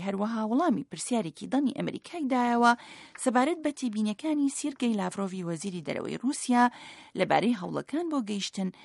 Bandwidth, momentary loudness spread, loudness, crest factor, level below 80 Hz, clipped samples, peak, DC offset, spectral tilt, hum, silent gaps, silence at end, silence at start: 11.5 kHz; 9 LU; -29 LUFS; 20 dB; -76 dBFS; under 0.1%; -8 dBFS; under 0.1%; -4.5 dB/octave; none; none; 0 s; 0 s